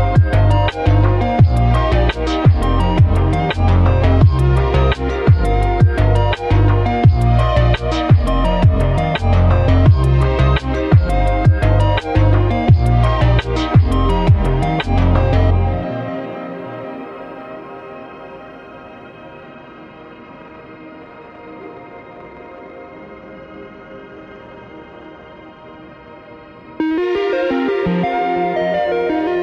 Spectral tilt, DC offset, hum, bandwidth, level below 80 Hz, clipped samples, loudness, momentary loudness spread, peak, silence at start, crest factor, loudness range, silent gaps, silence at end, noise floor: -8.5 dB/octave; under 0.1%; none; 9.6 kHz; -20 dBFS; under 0.1%; -15 LUFS; 23 LU; 0 dBFS; 0 s; 14 dB; 22 LU; none; 0 s; -38 dBFS